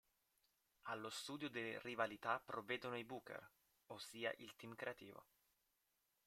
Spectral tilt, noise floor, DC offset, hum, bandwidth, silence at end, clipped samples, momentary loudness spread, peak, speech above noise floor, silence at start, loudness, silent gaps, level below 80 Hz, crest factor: -3.5 dB/octave; -86 dBFS; under 0.1%; none; 16 kHz; 1.05 s; under 0.1%; 13 LU; -26 dBFS; 37 dB; 0.85 s; -49 LUFS; none; -88 dBFS; 26 dB